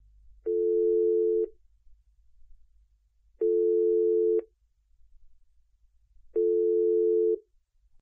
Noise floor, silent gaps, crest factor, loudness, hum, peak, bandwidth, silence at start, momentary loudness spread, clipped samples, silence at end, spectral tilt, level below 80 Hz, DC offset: -66 dBFS; none; 10 dB; -26 LUFS; none; -18 dBFS; 1.2 kHz; 0.45 s; 8 LU; under 0.1%; 0.65 s; -11.5 dB/octave; -62 dBFS; under 0.1%